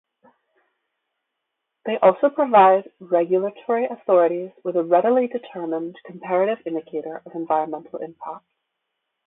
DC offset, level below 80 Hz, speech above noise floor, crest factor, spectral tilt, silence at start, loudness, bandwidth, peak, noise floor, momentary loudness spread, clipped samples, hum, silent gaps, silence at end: under 0.1%; -74 dBFS; 59 dB; 20 dB; -10.5 dB/octave; 1.85 s; -21 LUFS; 4 kHz; -2 dBFS; -80 dBFS; 17 LU; under 0.1%; none; none; 0.9 s